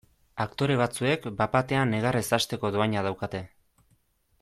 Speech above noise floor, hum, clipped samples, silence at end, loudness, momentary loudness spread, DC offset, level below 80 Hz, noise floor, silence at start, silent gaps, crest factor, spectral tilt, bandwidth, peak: 41 dB; none; under 0.1%; 0.95 s; -27 LUFS; 9 LU; under 0.1%; -56 dBFS; -67 dBFS; 0.35 s; none; 18 dB; -5.5 dB/octave; 15.5 kHz; -10 dBFS